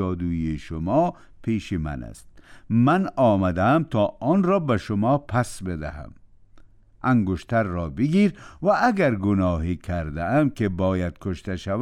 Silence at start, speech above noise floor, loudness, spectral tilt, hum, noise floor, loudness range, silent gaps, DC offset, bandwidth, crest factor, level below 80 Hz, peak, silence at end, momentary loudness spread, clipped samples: 0 s; 27 dB; -23 LUFS; -8 dB/octave; none; -50 dBFS; 4 LU; none; under 0.1%; 12.5 kHz; 14 dB; -42 dBFS; -8 dBFS; 0 s; 10 LU; under 0.1%